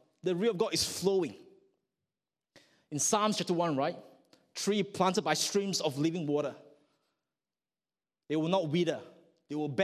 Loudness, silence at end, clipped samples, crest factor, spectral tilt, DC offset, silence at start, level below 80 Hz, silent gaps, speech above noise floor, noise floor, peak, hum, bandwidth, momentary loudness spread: -31 LUFS; 0 s; under 0.1%; 20 dB; -4 dB/octave; under 0.1%; 0.25 s; -70 dBFS; none; over 59 dB; under -90 dBFS; -12 dBFS; none; 15.5 kHz; 10 LU